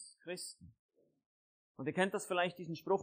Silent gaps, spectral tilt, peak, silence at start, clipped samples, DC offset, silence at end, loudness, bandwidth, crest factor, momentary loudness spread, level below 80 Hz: 0.79-0.89 s, 1.26-1.75 s; -4.5 dB/octave; -20 dBFS; 0 s; under 0.1%; under 0.1%; 0 s; -39 LUFS; 15.5 kHz; 20 dB; 12 LU; -80 dBFS